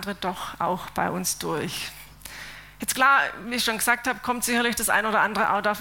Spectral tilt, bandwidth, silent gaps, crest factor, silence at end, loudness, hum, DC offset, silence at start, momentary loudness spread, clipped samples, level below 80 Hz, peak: -2.5 dB/octave; 17 kHz; none; 20 dB; 0 s; -24 LUFS; none; under 0.1%; 0 s; 17 LU; under 0.1%; -54 dBFS; -6 dBFS